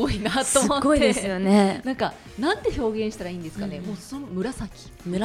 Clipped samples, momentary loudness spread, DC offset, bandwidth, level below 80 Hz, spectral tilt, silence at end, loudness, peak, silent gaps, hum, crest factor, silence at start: under 0.1%; 14 LU; under 0.1%; 16 kHz; -42 dBFS; -4.5 dB/octave; 0 s; -24 LUFS; -4 dBFS; none; none; 20 dB; 0 s